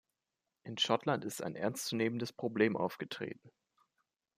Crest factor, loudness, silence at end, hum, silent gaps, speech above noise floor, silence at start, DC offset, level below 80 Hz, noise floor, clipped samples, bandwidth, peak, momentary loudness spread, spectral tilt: 22 dB; -36 LUFS; 0.9 s; none; none; 53 dB; 0.65 s; under 0.1%; -80 dBFS; -89 dBFS; under 0.1%; 15.5 kHz; -16 dBFS; 13 LU; -4.5 dB/octave